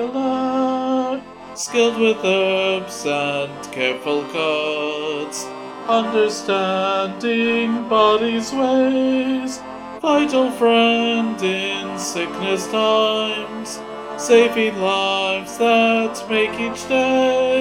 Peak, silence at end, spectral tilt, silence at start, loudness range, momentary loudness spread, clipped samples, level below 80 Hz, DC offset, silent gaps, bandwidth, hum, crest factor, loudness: 0 dBFS; 0 s; -3.5 dB/octave; 0 s; 3 LU; 11 LU; under 0.1%; -60 dBFS; under 0.1%; none; 16.5 kHz; none; 18 dB; -19 LUFS